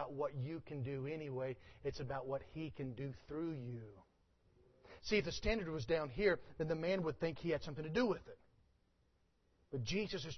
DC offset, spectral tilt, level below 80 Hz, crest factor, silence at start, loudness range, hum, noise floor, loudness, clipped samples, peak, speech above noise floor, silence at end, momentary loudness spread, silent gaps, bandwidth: under 0.1%; -5 dB/octave; -58 dBFS; 20 dB; 0 s; 7 LU; none; -77 dBFS; -41 LUFS; under 0.1%; -22 dBFS; 36 dB; 0 s; 11 LU; none; 6.2 kHz